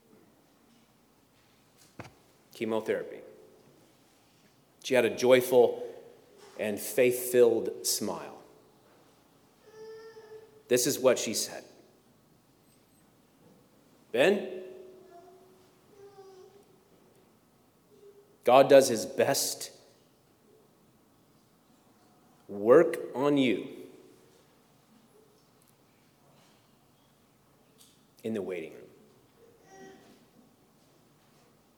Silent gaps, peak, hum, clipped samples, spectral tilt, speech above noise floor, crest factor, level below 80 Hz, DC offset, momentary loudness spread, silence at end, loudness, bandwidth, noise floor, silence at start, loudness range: none; -6 dBFS; none; under 0.1%; -3.5 dB/octave; 39 dB; 26 dB; -82 dBFS; under 0.1%; 28 LU; 1.9 s; -27 LUFS; over 20 kHz; -65 dBFS; 2 s; 16 LU